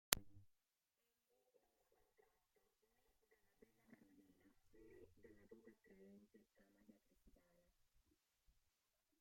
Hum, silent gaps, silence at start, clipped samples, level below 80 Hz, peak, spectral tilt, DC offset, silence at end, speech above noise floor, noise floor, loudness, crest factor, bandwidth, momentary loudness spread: none; none; 0.1 s; under 0.1%; -76 dBFS; -6 dBFS; -0.5 dB/octave; under 0.1%; 1.9 s; over 19 dB; under -90 dBFS; -43 LUFS; 54 dB; 16 kHz; 27 LU